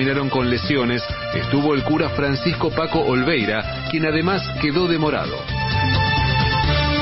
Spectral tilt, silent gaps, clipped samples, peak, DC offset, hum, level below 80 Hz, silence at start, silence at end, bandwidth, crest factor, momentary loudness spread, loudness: -10 dB/octave; none; under 0.1%; -6 dBFS; under 0.1%; none; -34 dBFS; 0 s; 0 s; 5.8 kHz; 14 dB; 6 LU; -20 LUFS